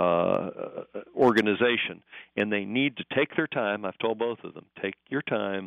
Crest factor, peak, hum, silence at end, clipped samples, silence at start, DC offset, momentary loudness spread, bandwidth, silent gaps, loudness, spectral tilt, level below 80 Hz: 18 dB; -10 dBFS; none; 0 s; under 0.1%; 0 s; under 0.1%; 15 LU; 6.6 kHz; none; -27 LUFS; -3.5 dB/octave; -70 dBFS